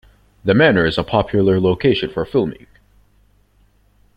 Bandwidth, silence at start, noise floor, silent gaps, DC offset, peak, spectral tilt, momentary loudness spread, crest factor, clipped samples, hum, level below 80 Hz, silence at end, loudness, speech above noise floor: 8.6 kHz; 0.45 s; -56 dBFS; none; under 0.1%; -2 dBFS; -8 dB/octave; 7 LU; 18 dB; under 0.1%; none; -44 dBFS; 1.6 s; -16 LUFS; 40 dB